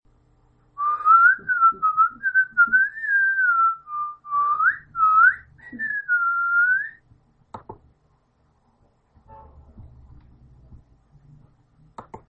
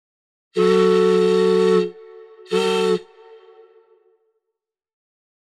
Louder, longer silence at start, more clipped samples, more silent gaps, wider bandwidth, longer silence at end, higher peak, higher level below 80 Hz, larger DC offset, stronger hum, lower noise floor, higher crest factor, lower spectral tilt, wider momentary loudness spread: about the same, -19 LUFS vs -18 LUFS; first, 0.8 s vs 0.55 s; neither; neither; second, 4.1 kHz vs 12 kHz; second, 0.1 s vs 2.45 s; about the same, -6 dBFS vs -6 dBFS; first, -58 dBFS vs -72 dBFS; neither; neither; second, -64 dBFS vs -82 dBFS; about the same, 18 dB vs 14 dB; about the same, -6 dB/octave vs -6 dB/octave; first, 14 LU vs 10 LU